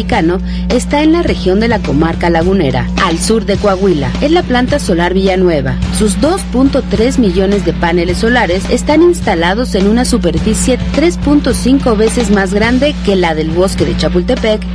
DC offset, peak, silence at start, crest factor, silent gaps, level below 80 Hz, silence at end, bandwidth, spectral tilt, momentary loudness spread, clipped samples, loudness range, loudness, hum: under 0.1%; 0 dBFS; 0 s; 10 dB; none; -22 dBFS; 0 s; 11 kHz; -5.5 dB/octave; 3 LU; under 0.1%; 1 LU; -11 LUFS; none